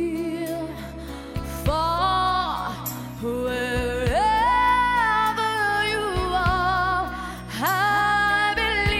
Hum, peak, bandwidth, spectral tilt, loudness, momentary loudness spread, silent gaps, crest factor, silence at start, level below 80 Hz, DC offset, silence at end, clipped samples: none; -10 dBFS; 16 kHz; -4.5 dB/octave; -22 LUFS; 12 LU; none; 14 dB; 0 s; -36 dBFS; under 0.1%; 0 s; under 0.1%